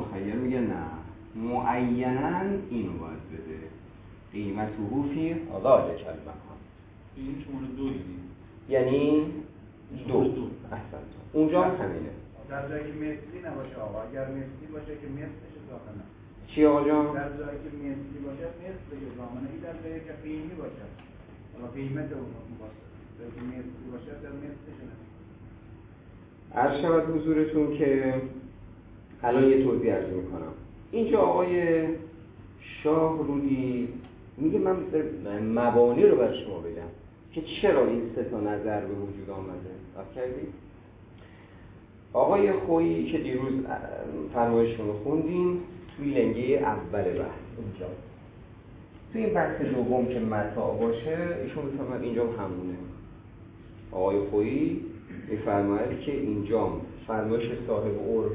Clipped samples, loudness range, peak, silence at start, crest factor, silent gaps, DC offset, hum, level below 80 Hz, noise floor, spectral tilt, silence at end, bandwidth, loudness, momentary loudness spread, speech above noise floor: under 0.1%; 13 LU; -6 dBFS; 0 s; 22 dB; none; under 0.1%; none; -52 dBFS; -50 dBFS; -11 dB/octave; 0 s; 4 kHz; -28 LUFS; 22 LU; 22 dB